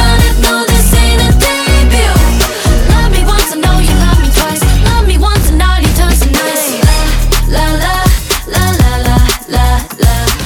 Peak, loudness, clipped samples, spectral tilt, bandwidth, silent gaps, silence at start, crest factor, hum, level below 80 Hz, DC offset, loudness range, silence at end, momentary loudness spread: 0 dBFS; -10 LUFS; 0.3%; -4.5 dB/octave; 19.5 kHz; none; 0 s; 8 dB; none; -10 dBFS; under 0.1%; 2 LU; 0 s; 3 LU